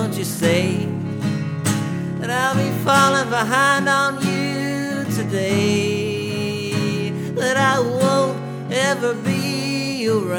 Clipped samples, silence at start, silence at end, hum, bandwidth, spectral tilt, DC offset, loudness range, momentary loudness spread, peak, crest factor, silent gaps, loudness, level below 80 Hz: under 0.1%; 0 s; 0 s; none; over 20 kHz; -5 dB/octave; under 0.1%; 3 LU; 8 LU; -2 dBFS; 18 dB; none; -20 LUFS; -62 dBFS